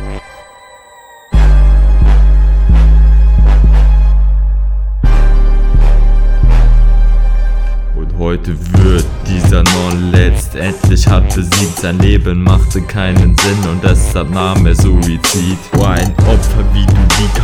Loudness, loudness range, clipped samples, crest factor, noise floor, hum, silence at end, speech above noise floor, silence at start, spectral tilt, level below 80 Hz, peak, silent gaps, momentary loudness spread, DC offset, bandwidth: -11 LUFS; 3 LU; 0.3%; 8 dB; -38 dBFS; none; 0 s; 28 dB; 0 s; -5.5 dB/octave; -10 dBFS; 0 dBFS; none; 7 LU; under 0.1%; 14.5 kHz